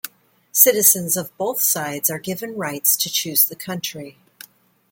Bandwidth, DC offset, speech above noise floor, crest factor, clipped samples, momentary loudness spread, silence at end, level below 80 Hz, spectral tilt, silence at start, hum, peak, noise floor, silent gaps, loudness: 17 kHz; under 0.1%; 29 dB; 22 dB; under 0.1%; 14 LU; 0.8 s; -68 dBFS; -2 dB/octave; 0.05 s; none; 0 dBFS; -49 dBFS; none; -17 LUFS